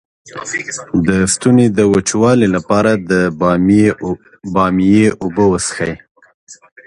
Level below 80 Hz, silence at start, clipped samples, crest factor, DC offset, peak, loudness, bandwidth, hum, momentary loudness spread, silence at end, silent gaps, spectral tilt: -40 dBFS; 0.25 s; under 0.1%; 14 dB; under 0.1%; 0 dBFS; -13 LUFS; 11.5 kHz; none; 11 LU; 0.3 s; 6.11-6.15 s, 6.34-6.47 s; -5.5 dB/octave